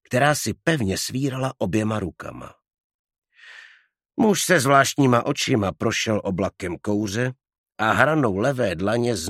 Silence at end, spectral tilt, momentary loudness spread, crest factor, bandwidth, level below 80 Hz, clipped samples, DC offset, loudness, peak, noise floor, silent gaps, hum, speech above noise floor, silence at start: 0 s; -4.5 dB/octave; 11 LU; 22 dB; 16 kHz; -54 dBFS; under 0.1%; under 0.1%; -22 LUFS; 0 dBFS; -54 dBFS; 2.84-3.04 s, 3.18-3.22 s, 7.58-7.64 s; none; 32 dB; 0.1 s